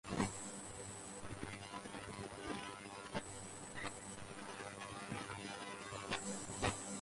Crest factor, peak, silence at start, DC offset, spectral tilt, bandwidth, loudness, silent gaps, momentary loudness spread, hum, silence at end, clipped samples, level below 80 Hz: 24 dB; -22 dBFS; 0.05 s; under 0.1%; -3.5 dB/octave; 11.5 kHz; -46 LUFS; none; 9 LU; none; 0 s; under 0.1%; -64 dBFS